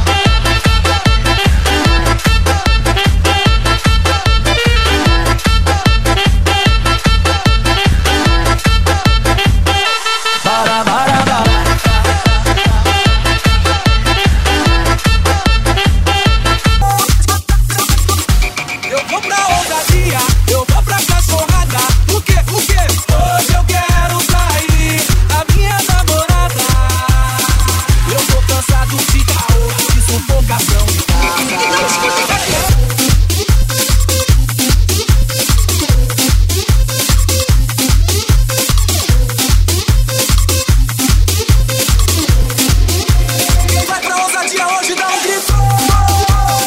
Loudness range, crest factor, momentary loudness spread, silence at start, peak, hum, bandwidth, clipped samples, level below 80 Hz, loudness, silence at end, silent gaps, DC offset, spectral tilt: 1 LU; 10 dB; 2 LU; 0 s; 0 dBFS; none; 16.5 kHz; under 0.1%; -14 dBFS; -12 LUFS; 0 s; none; under 0.1%; -3.5 dB/octave